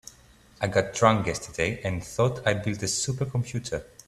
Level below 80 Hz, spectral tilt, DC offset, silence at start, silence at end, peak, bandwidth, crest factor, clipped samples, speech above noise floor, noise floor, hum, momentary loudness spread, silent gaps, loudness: -52 dBFS; -4.5 dB/octave; under 0.1%; 0.05 s; 0.25 s; -4 dBFS; 14 kHz; 24 dB; under 0.1%; 29 dB; -55 dBFS; none; 10 LU; none; -27 LUFS